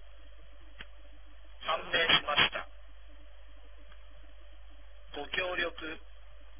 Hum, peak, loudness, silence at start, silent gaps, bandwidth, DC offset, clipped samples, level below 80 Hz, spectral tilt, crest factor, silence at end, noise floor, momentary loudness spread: none; -10 dBFS; -29 LUFS; 0 s; none; 3.7 kHz; 0.6%; under 0.1%; -54 dBFS; 0.5 dB/octave; 26 dB; 0 s; -53 dBFS; 26 LU